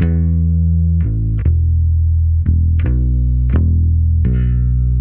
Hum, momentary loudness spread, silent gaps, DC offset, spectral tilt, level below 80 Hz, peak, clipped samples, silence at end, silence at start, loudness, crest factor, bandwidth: none; 2 LU; none; under 0.1%; -11.5 dB/octave; -16 dBFS; -2 dBFS; under 0.1%; 0 s; 0 s; -15 LUFS; 10 dB; 2.7 kHz